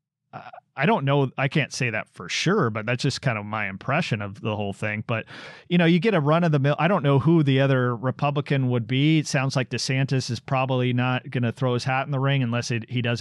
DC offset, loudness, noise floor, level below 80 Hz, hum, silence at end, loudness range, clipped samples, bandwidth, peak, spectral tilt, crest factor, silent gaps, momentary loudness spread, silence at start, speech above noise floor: under 0.1%; -23 LUFS; -43 dBFS; -66 dBFS; none; 0 s; 4 LU; under 0.1%; 11.5 kHz; -10 dBFS; -6 dB/octave; 14 dB; none; 9 LU; 0.35 s; 20 dB